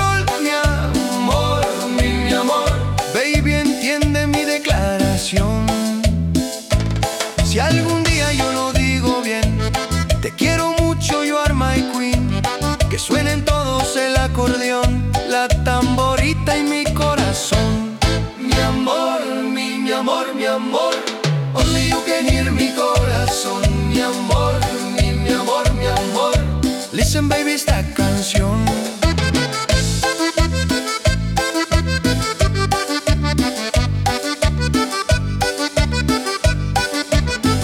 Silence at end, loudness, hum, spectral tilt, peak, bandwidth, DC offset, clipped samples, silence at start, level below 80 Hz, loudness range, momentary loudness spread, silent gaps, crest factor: 0 s; -18 LUFS; none; -4.5 dB/octave; -4 dBFS; 18 kHz; under 0.1%; under 0.1%; 0 s; -26 dBFS; 1 LU; 3 LU; none; 14 dB